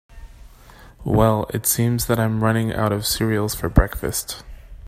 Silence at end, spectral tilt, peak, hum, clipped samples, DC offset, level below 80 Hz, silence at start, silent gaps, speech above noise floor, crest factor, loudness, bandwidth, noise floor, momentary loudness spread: 0 s; -5 dB/octave; 0 dBFS; none; under 0.1%; under 0.1%; -30 dBFS; 0.1 s; none; 25 dB; 20 dB; -20 LUFS; 16 kHz; -45 dBFS; 7 LU